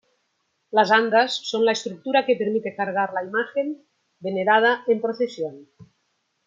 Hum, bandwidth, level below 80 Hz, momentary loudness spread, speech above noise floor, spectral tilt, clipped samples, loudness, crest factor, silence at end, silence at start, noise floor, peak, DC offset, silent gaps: none; 7.6 kHz; -76 dBFS; 12 LU; 51 dB; -4 dB/octave; under 0.1%; -22 LUFS; 20 dB; 0.65 s; 0.75 s; -72 dBFS; -2 dBFS; under 0.1%; none